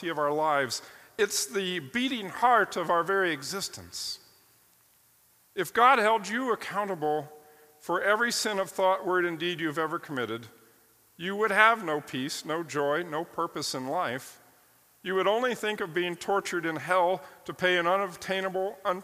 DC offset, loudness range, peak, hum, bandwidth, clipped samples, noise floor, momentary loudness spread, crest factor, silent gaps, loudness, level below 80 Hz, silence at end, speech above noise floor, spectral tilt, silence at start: under 0.1%; 4 LU; -6 dBFS; none; 15.5 kHz; under 0.1%; -63 dBFS; 12 LU; 24 dB; none; -28 LUFS; -74 dBFS; 0 s; 35 dB; -3 dB/octave; 0 s